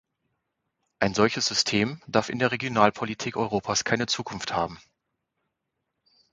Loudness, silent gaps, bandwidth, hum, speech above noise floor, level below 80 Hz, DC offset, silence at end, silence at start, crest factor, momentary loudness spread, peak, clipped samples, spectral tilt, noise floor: -25 LUFS; none; 9.6 kHz; none; 56 dB; -58 dBFS; under 0.1%; 1.55 s; 1 s; 26 dB; 7 LU; -2 dBFS; under 0.1%; -3.5 dB/octave; -81 dBFS